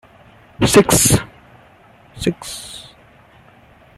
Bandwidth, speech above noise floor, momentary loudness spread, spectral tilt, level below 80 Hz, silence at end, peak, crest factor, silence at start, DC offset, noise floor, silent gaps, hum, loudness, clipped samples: 16 kHz; 32 dB; 23 LU; -4 dB/octave; -40 dBFS; 1.15 s; 0 dBFS; 20 dB; 0.6 s; under 0.1%; -48 dBFS; none; none; -15 LUFS; under 0.1%